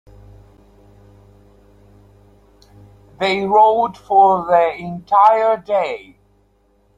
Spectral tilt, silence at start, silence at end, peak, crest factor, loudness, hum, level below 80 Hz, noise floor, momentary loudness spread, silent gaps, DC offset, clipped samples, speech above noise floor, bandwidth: -6 dB/octave; 3.2 s; 1 s; -2 dBFS; 16 dB; -15 LUFS; 50 Hz at -50 dBFS; -54 dBFS; -58 dBFS; 10 LU; none; under 0.1%; under 0.1%; 43 dB; 8.4 kHz